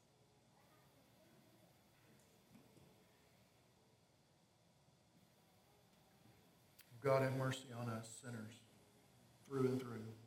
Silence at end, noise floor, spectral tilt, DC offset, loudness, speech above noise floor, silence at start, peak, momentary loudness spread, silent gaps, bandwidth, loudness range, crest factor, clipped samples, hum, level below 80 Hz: 0 s; -74 dBFS; -6 dB/octave; under 0.1%; -43 LUFS; 32 dB; 2.55 s; -24 dBFS; 18 LU; none; 16 kHz; 3 LU; 26 dB; under 0.1%; none; -86 dBFS